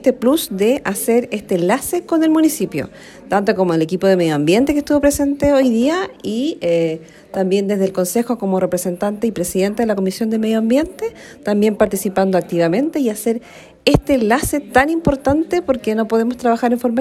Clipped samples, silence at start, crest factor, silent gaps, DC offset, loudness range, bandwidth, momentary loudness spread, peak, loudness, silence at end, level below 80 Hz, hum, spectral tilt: under 0.1%; 0 s; 16 dB; none; under 0.1%; 3 LU; 16 kHz; 7 LU; 0 dBFS; -17 LUFS; 0 s; -40 dBFS; none; -5.5 dB/octave